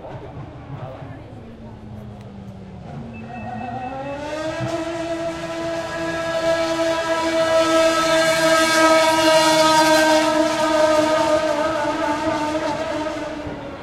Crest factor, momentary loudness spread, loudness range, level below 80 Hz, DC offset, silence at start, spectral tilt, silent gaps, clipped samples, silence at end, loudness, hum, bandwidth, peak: 18 dB; 22 LU; 18 LU; -48 dBFS; under 0.1%; 0 s; -3.5 dB/octave; none; under 0.1%; 0 s; -18 LUFS; none; 16 kHz; -2 dBFS